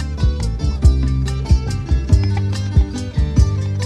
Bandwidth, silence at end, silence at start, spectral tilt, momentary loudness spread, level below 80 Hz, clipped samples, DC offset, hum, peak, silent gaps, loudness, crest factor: 9.8 kHz; 0 s; 0 s; -7 dB/octave; 5 LU; -18 dBFS; under 0.1%; under 0.1%; none; 0 dBFS; none; -18 LUFS; 16 dB